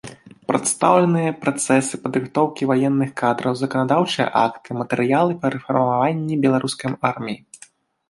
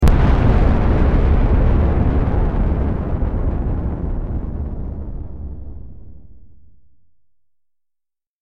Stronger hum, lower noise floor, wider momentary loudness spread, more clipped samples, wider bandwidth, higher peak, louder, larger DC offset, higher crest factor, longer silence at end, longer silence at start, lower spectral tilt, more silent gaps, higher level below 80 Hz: neither; second, -50 dBFS vs -78 dBFS; second, 7 LU vs 16 LU; neither; first, 11.5 kHz vs 5.8 kHz; about the same, -2 dBFS vs -2 dBFS; about the same, -20 LUFS vs -19 LUFS; neither; about the same, 18 dB vs 14 dB; second, 0.55 s vs 1.2 s; about the same, 0.05 s vs 0 s; second, -5 dB/octave vs -9 dB/octave; neither; second, -62 dBFS vs -20 dBFS